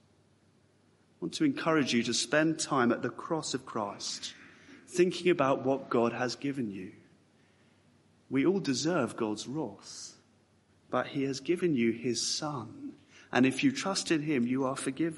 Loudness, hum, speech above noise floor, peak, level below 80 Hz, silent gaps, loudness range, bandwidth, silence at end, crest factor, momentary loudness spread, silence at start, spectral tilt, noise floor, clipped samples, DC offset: -31 LUFS; none; 36 dB; -10 dBFS; -76 dBFS; none; 4 LU; 11.5 kHz; 0 s; 22 dB; 13 LU; 1.2 s; -4 dB/octave; -66 dBFS; under 0.1%; under 0.1%